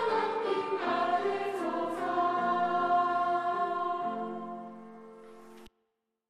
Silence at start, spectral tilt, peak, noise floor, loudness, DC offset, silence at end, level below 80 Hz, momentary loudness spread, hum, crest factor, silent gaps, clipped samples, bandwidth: 0 s; -5.5 dB/octave; -16 dBFS; -81 dBFS; -30 LUFS; under 0.1%; 0.6 s; -76 dBFS; 19 LU; none; 14 dB; none; under 0.1%; 11.5 kHz